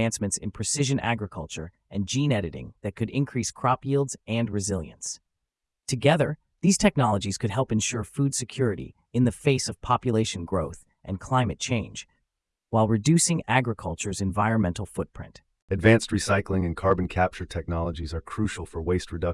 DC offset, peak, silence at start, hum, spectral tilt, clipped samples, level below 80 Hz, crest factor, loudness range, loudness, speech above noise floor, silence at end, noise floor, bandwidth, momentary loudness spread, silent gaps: under 0.1%; -4 dBFS; 0 s; none; -5 dB/octave; under 0.1%; -48 dBFS; 22 dB; 3 LU; -26 LUFS; 58 dB; 0 s; -84 dBFS; 12 kHz; 14 LU; 15.62-15.68 s